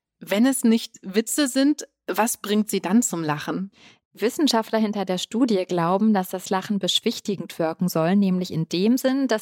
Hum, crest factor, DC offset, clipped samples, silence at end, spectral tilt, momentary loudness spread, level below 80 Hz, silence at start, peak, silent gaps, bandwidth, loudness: none; 16 dB; under 0.1%; under 0.1%; 0 s; -4.5 dB/octave; 7 LU; -72 dBFS; 0.2 s; -6 dBFS; 4.05-4.11 s; 17 kHz; -23 LUFS